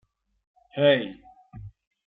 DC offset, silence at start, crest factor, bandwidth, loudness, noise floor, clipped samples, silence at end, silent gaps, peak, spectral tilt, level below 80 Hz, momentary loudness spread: under 0.1%; 0.75 s; 20 dB; 4.2 kHz; -22 LUFS; -45 dBFS; under 0.1%; 0.5 s; none; -8 dBFS; -9 dB/octave; -60 dBFS; 24 LU